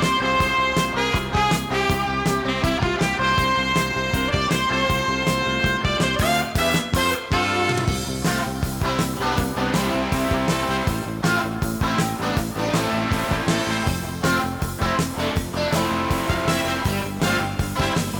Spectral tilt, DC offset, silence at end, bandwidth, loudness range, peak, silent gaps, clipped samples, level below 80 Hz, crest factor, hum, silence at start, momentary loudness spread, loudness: -4.5 dB/octave; under 0.1%; 0 s; over 20 kHz; 2 LU; -8 dBFS; none; under 0.1%; -36 dBFS; 14 dB; none; 0 s; 4 LU; -22 LUFS